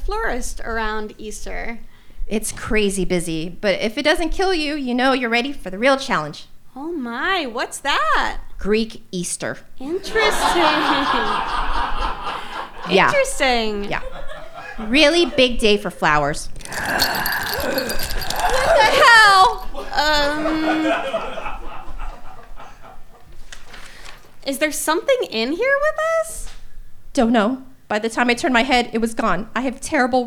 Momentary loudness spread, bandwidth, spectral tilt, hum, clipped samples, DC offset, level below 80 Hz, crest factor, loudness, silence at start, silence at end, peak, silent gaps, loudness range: 16 LU; 17.5 kHz; -3 dB/octave; none; under 0.1%; under 0.1%; -32 dBFS; 18 dB; -19 LUFS; 0 s; 0 s; -2 dBFS; none; 10 LU